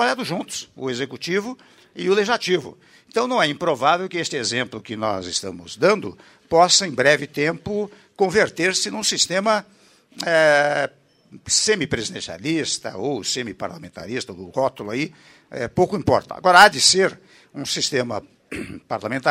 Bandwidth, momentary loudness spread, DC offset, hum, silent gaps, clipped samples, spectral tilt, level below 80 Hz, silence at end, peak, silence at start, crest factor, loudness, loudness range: 16 kHz; 16 LU; under 0.1%; none; none; under 0.1%; -2.5 dB/octave; -56 dBFS; 0 s; 0 dBFS; 0 s; 22 dB; -20 LUFS; 7 LU